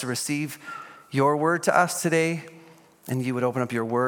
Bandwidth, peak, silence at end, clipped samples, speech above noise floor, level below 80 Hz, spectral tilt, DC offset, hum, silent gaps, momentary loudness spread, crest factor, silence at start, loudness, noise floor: 17.5 kHz; -4 dBFS; 0 s; under 0.1%; 27 dB; -74 dBFS; -5 dB/octave; under 0.1%; none; none; 15 LU; 22 dB; 0 s; -25 LUFS; -51 dBFS